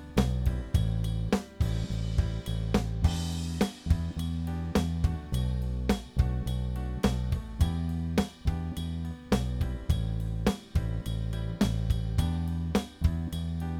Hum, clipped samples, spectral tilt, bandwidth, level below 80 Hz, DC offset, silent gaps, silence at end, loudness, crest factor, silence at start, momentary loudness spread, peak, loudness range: none; under 0.1%; -6.5 dB/octave; 16.5 kHz; -34 dBFS; under 0.1%; none; 0 s; -31 LUFS; 18 dB; 0 s; 4 LU; -12 dBFS; 1 LU